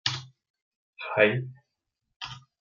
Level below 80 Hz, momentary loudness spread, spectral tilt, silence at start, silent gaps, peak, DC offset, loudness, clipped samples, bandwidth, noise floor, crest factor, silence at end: -70 dBFS; 18 LU; -4.5 dB/octave; 0.05 s; 0.50-0.54 s, 0.62-0.93 s, 2.16-2.20 s; -6 dBFS; under 0.1%; -26 LUFS; under 0.1%; 7.6 kHz; -82 dBFS; 24 dB; 0.3 s